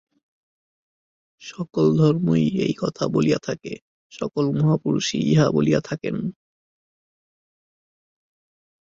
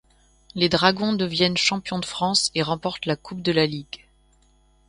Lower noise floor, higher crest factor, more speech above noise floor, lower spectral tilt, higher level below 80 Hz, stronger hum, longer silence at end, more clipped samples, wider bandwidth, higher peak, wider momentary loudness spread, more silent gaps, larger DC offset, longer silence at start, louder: first, under -90 dBFS vs -59 dBFS; second, 18 dB vs 24 dB; first, over 69 dB vs 36 dB; first, -6.5 dB/octave vs -4 dB/octave; about the same, -58 dBFS vs -54 dBFS; neither; first, 2.6 s vs 0.9 s; neither; second, 7.6 kHz vs 11.5 kHz; second, -4 dBFS vs 0 dBFS; first, 14 LU vs 11 LU; first, 3.82-4.10 s vs none; neither; first, 1.4 s vs 0.55 s; about the same, -21 LUFS vs -22 LUFS